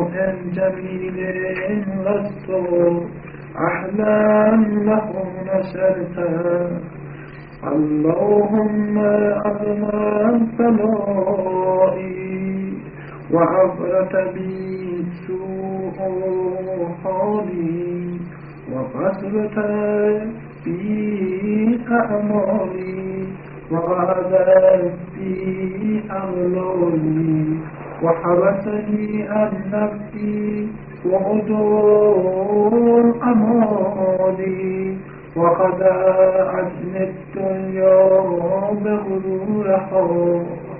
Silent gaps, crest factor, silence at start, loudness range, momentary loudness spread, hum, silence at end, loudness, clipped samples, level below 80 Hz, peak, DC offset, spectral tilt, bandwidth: none; 16 dB; 0 s; 6 LU; 12 LU; none; 0 s; -19 LUFS; under 0.1%; -50 dBFS; -4 dBFS; under 0.1%; -9 dB/octave; 3.1 kHz